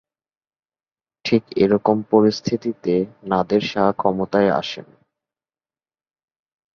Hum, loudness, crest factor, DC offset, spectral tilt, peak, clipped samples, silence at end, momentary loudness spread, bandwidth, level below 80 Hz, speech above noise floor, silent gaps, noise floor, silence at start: none; -19 LUFS; 20 dB; under 0.1%; -6.5 dB/octave; -2 dBFS; under 0.1%; 1.95 s; 7 LU; 7 kHz; -56 dBFS; over 71 dB; none; under -90 dBFS; 1.25 s